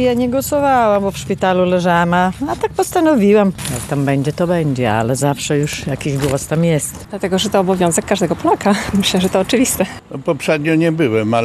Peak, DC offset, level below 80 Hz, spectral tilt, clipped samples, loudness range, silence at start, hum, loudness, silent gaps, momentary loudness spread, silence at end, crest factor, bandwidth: 0 dBFS; under 0.1%; -42 dBFS; -5 dB/octave; under 0.1%; 2 LU; 0 s; none; -16 LUFS; none; 7 LU; 0 s; 14 dB; 13.5 kHz